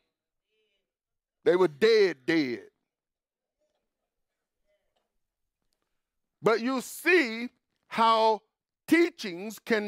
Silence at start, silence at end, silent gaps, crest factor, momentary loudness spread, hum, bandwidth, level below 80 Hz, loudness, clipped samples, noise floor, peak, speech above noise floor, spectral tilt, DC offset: 1.45 s; 0 s; none; 18 dB; 14 LU; none; 16 kHz; -80 dBFS; -25 LUFS; under 0.1%; under -90 dBFS; -10 dBFS; over 65 dB; -4.5 dB/octave; under 0.1%